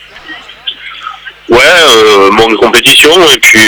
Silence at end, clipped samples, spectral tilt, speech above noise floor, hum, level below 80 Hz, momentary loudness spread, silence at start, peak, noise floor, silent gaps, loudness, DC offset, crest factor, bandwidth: 0 s; 10%; -1.5 dB/octave; 24 dB; none; -36 dBFS; 20 LU; 0.25 s; 0 dBFS; -27 dBFS; none; -2 LUFS; under 0.1%; 6 dB; over 20 kHz